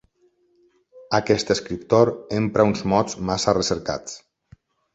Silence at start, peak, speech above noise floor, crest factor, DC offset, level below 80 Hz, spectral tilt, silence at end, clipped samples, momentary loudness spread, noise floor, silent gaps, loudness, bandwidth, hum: 0.95 s; -2 dBFS; 42 dB; 20 dB; under 0.1%; -50 dBFS; -5 dB/octave; 0.75 s; under 0.1%; 10 LU; -63 dBFS; none; -21 LUFS; 8.2 kHz; none